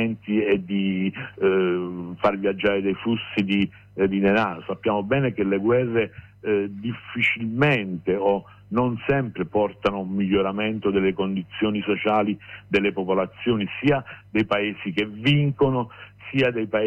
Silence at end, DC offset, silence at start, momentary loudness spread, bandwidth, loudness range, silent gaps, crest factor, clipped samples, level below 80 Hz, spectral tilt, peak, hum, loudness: 0 s; under 0.1%; 0 s; 7 LU; 7.6 kHz; 1 LU; none; 14 dB; under 0.1%; -54 dBFS; -8 dB/octave; -10 dBFS; none; -23 LUFS